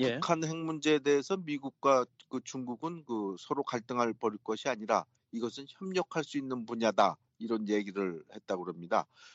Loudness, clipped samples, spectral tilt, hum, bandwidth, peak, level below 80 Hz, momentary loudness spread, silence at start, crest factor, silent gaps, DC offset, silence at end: -33 LUFS; under 0.1%; -5 dB/octave; none; 8 kHz; -10 dBFS; -78 dBFS; 11 LU; 0 s; 22 dB; none; under 0.1%; 0.05 s